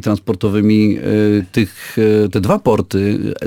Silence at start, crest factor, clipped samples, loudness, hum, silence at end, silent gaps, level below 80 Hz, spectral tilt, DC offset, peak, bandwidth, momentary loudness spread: 0.05 s; 12 dB; under 0.1%; -15 LUFS; none; 0 s; none; -44 dBFS; -7.5 dB/octave; under 0.1%; -2 dBFS; 17 kHz; 5 LU